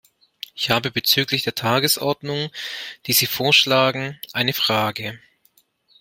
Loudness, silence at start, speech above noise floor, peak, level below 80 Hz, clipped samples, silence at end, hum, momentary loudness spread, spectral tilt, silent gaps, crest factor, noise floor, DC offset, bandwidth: -19 LUFS; 0.55 s; 40 dB; -2 dBFS; -60 dBFS; under 0.1%; 0.85 s; none; 15 LU; -3 dB/octave; none; 20 dB; -61 dBFS; under 0.1%; 16.5 kHz